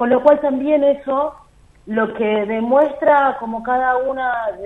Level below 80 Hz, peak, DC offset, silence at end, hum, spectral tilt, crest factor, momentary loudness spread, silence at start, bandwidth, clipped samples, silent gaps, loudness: -52 dBFS; 0 dBFS; under 0.1%; 0 s; none; -7.5 dB/octave; 16 dB; 7 LU; 0 s; 4.1 kHz; under 0.1%; none; -17 LUFS